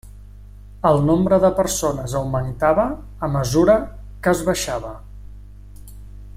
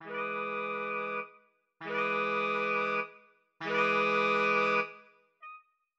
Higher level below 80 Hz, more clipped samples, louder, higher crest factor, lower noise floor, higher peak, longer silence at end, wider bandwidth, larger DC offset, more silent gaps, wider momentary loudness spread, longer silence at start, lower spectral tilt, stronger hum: first, -38 dBFS vs -84 dBFS; neither; first, -19 LUFS vs -30 LUFS; about the same, 18 dB vs 18 dB; second, -39 dBFS vs -64 dBFS; first, -2 dBFS vs -14 dBFS; second, 0.05 s vs 0.4 s; first, 16.5 kHz vs 8 kHz; neither; neither; second, 11 LU vs 17 LU; about the same, 0.05 s vs 0 s; about the same, -5.5 dB/octave vs -5 dB/octave; first, 50 Hz at -35 dBFS vs none